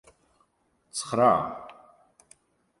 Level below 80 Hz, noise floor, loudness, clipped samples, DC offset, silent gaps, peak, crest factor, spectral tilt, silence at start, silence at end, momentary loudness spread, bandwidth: -66 dBFS; -70 dBFS; -25 LUFS; under 0.1%; under 0.1%; none; -8 dBFS; 22 dB; -4.5 dB/octave; 0.95 s; 1.1 s; 21 LU; 11.5 kHz